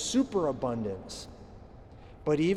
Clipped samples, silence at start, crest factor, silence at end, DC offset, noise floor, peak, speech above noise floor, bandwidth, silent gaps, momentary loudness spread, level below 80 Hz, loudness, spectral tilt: under 0.1%; 0 s; 14 dB; 0 s; under 0.1%; -50 dBFS; -16 dBFS; 21 dB; 13 kHz; none; 24 LU; -54 dBFS; -32 LUFS; -5 dB/octave